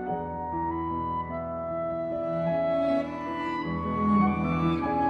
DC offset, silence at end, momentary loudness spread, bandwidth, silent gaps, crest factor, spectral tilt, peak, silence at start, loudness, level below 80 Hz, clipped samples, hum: under 0.1%; 0 s; 8 LU; 6.4 kHz; none; 16 dB; -9 dB/octave; -12 dBFS; 0 s; -28 LUFS; -48 dBFS; under 0.1%; none